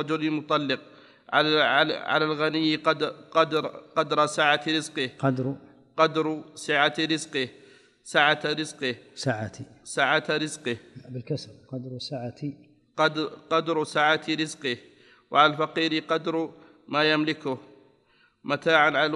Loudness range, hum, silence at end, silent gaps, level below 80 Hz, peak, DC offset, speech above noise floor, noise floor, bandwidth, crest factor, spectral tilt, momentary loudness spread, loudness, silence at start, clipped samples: 5 LU; none; 0 s; none; -74 dBFS; -4 dBFS; under 0.1%; 38 dB; -63 dBFS; 11.5 kHz; 22 dB; -4.5 dB/octave; 14 LU; -25 LUFS; 0 s; under 0.1%